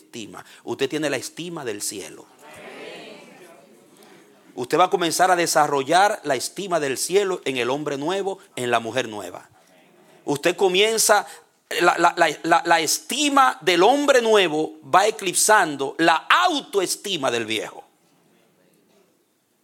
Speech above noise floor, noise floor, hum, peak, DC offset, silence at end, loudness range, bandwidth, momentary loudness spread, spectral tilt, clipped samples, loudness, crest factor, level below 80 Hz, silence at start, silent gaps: 45 dB; -66 dBFS; none; 0 dBFS; under 0.1%; 1.85 s; 12 LU; 17.5 kHz; 19 LU; -2.5 dB/octave; under 0.1%; -20 LUFS; 22 dB; -74 dBFS; 0.15 s; none